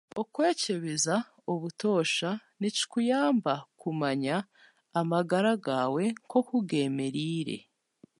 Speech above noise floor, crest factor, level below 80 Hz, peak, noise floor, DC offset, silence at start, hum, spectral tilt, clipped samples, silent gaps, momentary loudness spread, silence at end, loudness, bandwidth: 32 dB; 16 dB; -80 dBFS; -12 dBFS; -61 dBFS; under 0.1%; 0.15 s; none; -4.5 dB/octave; under 0.1%; none; 8 LU; 0.6 s; -29 LUFS; 11.5 kHz